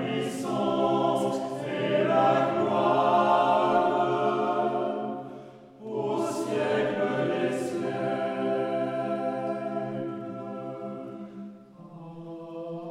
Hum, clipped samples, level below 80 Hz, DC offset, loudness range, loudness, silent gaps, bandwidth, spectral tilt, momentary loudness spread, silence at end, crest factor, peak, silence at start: none; under 0.1%; -74 dBFS; under 0.1%; 10 LU; -27 LUFS; none; 13.5 kHz; -6 dB/octave; 18 LU; 0 s; 16 dB; -10 dBFS; 0 s